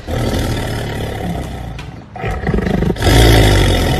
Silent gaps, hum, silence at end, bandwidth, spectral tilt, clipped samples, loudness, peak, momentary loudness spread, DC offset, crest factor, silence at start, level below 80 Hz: none; none; 0 s; 14 kHz; -5.5 dB/octave; under 0.1%; -15 LUFS; 0 dBFS; 17 LU; under 0.1%; 14 dB; 0 s; -20 dBFS